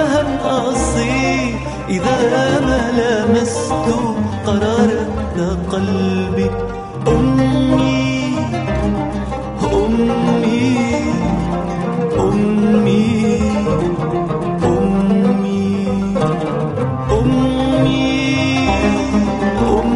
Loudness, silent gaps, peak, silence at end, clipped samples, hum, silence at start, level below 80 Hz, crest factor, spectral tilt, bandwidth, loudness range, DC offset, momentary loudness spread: -16 LUFS; none; -2 dBFS; 0 s; under 0.1%; none; 0 s; -30 dBFS; 14 dB; -6.5 dB/octave; 11 kHz; 1 LU; under 0.1%; 6 LU